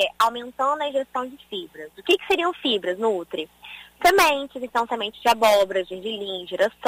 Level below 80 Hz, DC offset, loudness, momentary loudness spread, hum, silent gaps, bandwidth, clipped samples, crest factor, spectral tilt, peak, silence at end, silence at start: -58 dBFS; under 0.1%; -22 LUFS; 15 LU; none; none; 16 kHz; under 0.1%; 16 dB; -2.5 dB/octave; -6 dBFS; 0 s; 0 s